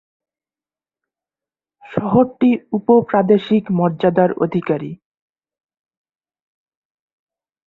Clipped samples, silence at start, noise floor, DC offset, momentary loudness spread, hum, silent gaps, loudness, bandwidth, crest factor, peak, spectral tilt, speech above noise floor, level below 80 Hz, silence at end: under 0.1%; 1.85 s; under -90 dBFS; under 0.1%; 9 LU; none; none; -17 LUFS; 4.2 kHz; 18 dB; -2 dBFS; -10 dB/octave; over 74 dB; -58 dBFS; 2.7 s